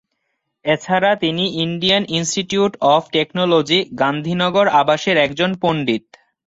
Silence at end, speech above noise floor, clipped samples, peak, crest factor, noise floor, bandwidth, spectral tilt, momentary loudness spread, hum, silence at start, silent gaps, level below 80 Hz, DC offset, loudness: 0.5 s; 56 dB; under 0.1%; -2 dBFS; 16 dB; -73 dBFS; 8 kHz; -4.5 dB/octave; 6 LU; none; 0.65 s; none; -56 dBFS; under 0.1%; -17 LUFS